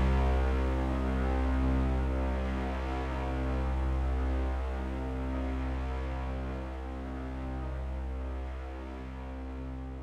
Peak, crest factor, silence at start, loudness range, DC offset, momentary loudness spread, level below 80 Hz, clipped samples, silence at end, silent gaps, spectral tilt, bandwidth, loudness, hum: -18 dBFS; 14 dB; 0 s; 7 LU; under 0.1%; 11 LU; -34 dBFS; under 0.1%; 0 s; none; -8 dB/octave; 6.4 kHz; -34 LUFS; none